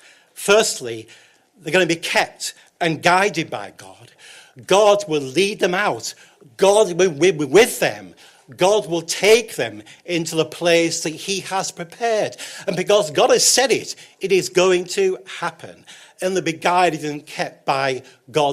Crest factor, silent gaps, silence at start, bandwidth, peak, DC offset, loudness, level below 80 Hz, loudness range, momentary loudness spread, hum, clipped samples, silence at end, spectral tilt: 18 dB; none; 0.35 s; 16 kHz; -2 dBFS; under 0.1%; -18 LUFS; -62 dBFS; 4 LU; 14 LU; none; under 0.1%; 0 s; -3 dB/octave